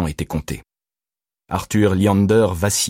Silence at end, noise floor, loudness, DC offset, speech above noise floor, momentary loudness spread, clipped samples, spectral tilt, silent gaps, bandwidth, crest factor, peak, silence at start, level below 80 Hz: 0 s; under -90 dBFS; -18 LUFS; under 0.1%; over 72 dB; 13 LU; under 0.1%; -5 dB/octave; none; 16.5 kHz; 14 dB; -4 dBFS; 0 s; -40 dBFS